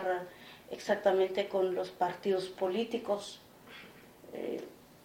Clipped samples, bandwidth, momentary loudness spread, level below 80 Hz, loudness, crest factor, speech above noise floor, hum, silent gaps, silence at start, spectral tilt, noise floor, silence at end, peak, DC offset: under 0.1%; 17 kHz; 21 LU; -74 dBFS; -34 LUFS; 20 dB; 22 dB; none; none; 0 s; -5 dB/octave; -54 dBFS; 0.1 s; -14 dBFS; under 0.1%